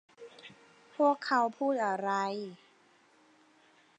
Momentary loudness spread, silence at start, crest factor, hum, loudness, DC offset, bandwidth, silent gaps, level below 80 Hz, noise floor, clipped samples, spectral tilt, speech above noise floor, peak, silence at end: 23 LU; 0.2 s; 20 dB; none; -31 LUFS; under 0.1%; 9.2 kHz; none; under -90 dBFS; -65 dBFS; under 0.1%; -5 dB/octave; 34 dB; -16 dBFS; 1.45 s